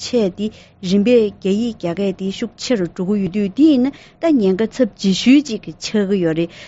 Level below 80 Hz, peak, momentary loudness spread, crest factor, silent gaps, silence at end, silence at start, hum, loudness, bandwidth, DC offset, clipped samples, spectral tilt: -52 dBFS; -2 dBFS; 11 LU; 14 dB; none; 0 s; 0 s; none; -17 LUFS; 8 kHz; under 0.1%; under 0.1%; -6 dB/octave